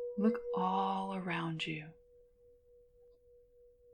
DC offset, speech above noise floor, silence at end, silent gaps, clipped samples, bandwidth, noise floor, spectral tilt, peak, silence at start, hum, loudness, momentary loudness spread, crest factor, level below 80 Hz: under 0.1%; 29 dB; 2 s; none; under 0.1%; 9.6 kHz; -65 dBFS; -7 dB/octave; -20 dBFS; 0 s; none; -36 LUFS; 8 LU; 20 dB; -72 dBFS